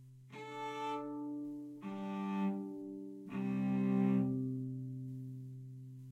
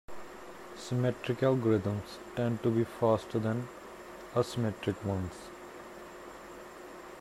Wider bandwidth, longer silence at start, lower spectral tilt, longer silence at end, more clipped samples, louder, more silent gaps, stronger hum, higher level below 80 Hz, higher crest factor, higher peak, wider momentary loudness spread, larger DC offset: second, 8.4 kHz vs 15 kHz; about the same, 0 s vs 0.1 s; first, -8.5 dB/octave vs -7 dB/octave; about the same, 0 s vs 0 s; neither; second, -39 LUFS vs -32 LUFS; neither; neither; second, -80 dBFS vs -62 dBFS; about the same, 16 dB vs 18 dB; second, -22 dBFS vs -14 dBFS; about the same, 16 LU vs 18 LU; neither